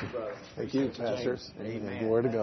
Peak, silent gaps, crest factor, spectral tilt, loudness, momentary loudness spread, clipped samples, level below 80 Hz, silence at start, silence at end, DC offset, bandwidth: -16 dBFS; none; 16 dB; -7 dB/octave; -33 LUFS; 10 LU; under 0.1%; -62 dBFS; 0 s; 0 s; under 0.1%; 6.4 kHz